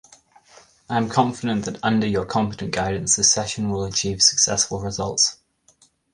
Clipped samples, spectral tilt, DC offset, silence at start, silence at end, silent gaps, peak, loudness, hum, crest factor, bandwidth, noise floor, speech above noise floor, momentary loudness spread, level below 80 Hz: under 0.1%; -2.5 dB/octave; under 0.1%; 0.9 s; 0.8 s; none; -2 dBFS; -20 LUFS; none; 20 dB; 11.5 kHz; -59 dBFS; 37 dB; 9 LU; -48 dBFS